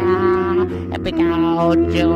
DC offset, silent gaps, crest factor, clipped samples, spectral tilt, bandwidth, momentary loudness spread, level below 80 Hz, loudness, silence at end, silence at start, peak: under 0.1%; none; 12 dB; under 0.1%; -8 dB/octave; 7.2 kHz; 7 LU; -36 dBFS; -17 LUFS; 0 s; 0 s; -4 dBFS